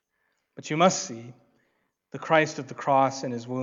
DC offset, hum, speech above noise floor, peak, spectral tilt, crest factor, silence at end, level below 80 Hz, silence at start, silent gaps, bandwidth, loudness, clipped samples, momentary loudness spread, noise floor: under 0.1%; none; 50 dB; -6 dBFS; -4.5 dB/octave; 22 dB; 0 s; -80 dBFS; 0.6 s; none; 7.8 kHz; -25 LUFS; under 0.1%; 19 LU; -75 dBFS